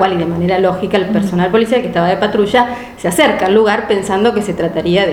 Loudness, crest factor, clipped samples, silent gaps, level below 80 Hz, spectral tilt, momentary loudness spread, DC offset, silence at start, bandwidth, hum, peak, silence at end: -13 LUFS; 12 dB; under 0.1%; none; -42 dBFS; -5.5 dB/octave; 5 LU; under 0.1%; 0 s; 17.5 kHz; none; 0 dBFS; 0 s